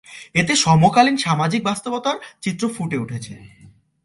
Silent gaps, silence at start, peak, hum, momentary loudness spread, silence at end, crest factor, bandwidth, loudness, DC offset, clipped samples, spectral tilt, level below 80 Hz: none; 0.1 s; 0 dBFS; none; 13 LU; 0.55 s; 20 dB; 11.5 kHz; -18 LUFS; under 0.1%; under 0.1%; -4.5 dB/octave; -54 dBFS